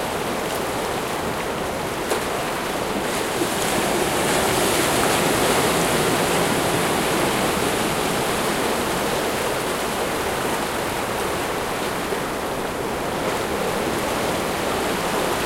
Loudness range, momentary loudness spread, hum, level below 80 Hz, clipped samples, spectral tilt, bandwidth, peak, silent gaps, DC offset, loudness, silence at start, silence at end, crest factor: 5 LU; 6 LU; none; -42 dBFS; under 0.1%; -3.5 dB/octave; 16 kHz; -6 dBFS; none; under 0.1%; -22 LUFS; 0 s; 0 s; 16 dB